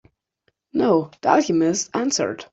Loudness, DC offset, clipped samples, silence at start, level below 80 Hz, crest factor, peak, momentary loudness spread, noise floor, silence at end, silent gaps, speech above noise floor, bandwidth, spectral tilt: -20 LUFS; under 0.1%; under 0.1%; 0.75 s; -64 dBFS; 18 dB; -4 dBFS; 5 LU; -70 dBFS; 0.1 s; none; 50 dB; 8.2 kHz; -4 dB/octave